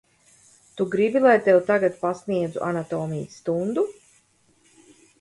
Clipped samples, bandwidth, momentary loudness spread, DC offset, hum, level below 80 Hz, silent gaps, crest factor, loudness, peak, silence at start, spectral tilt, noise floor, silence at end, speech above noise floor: under 0.1%; 11.5 kHz; 12 LU; under 0.1%; none; -66 dBFS; none; 18 dB; -23 LUFS; -6 dBFS; 0.75 s; -7 dB/octave; -62 dBFS; 1.3 s; 40 dB